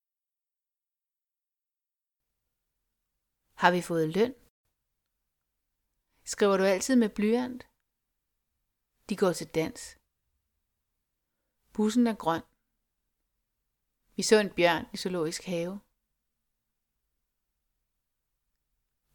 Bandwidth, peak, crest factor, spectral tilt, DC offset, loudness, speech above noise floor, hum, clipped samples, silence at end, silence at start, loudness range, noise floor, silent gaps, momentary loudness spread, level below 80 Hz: 19 kHz; -6 dBFS; 28 dB; -4.5 dB/octave; under 0.1%; -28 LUFS; over 63 dB; none; under 0.1%; 3.35 s; 3.6 s; 6 LU; under -90 dBFS; 4.50-4.64 s; 15 LU; -66 dBFS